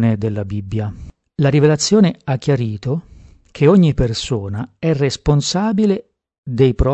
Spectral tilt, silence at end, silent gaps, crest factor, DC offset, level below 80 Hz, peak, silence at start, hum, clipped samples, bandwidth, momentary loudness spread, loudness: -6.5 dB/octave; 0 s; 6.38-6.43 s; 16 dB; under 0.1%; -34 dBFS; 0 dBFS; 0 s; none; under 0.1%; 8.6 kHz; 12 LU; -17 LUFS